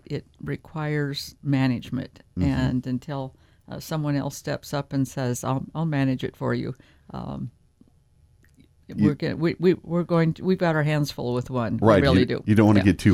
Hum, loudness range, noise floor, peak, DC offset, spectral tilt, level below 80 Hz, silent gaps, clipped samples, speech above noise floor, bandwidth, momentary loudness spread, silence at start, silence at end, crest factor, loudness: none; 8 LU; -58 dBFS; -4 dBFS; under 0.1%; -7 dB/octave; -46 dBFS; none; under 0.1%; 35 dB; 16 kHz; 16 LU; 0.1 s; 0 s; 20 dB; -24 LUFS